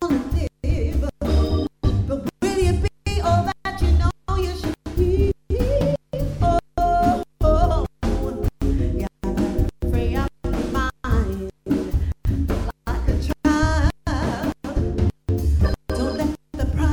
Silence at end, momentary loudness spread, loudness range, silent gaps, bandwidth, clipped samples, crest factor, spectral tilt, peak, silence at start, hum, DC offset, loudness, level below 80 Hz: 0 s; 6 LU; 3 LU; none; 18 kHz; under 0.1%; 16 dB; -7 dB/octave; -6 dBFS; 0 s; none; under 0.1%; -23 LUFS; -24 dBFS